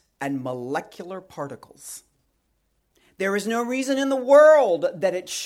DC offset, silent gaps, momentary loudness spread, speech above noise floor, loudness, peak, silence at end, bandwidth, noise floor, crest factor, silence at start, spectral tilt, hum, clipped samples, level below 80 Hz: under 0.1%; none; 24 LU; 49 dB; -20 LUFS; -4 dBFS; 0 s; 15 kHz; -70 dBFS; 18 dB; 0.2 s; -4 dB/octave; none; under 0.1%; -72 dBFS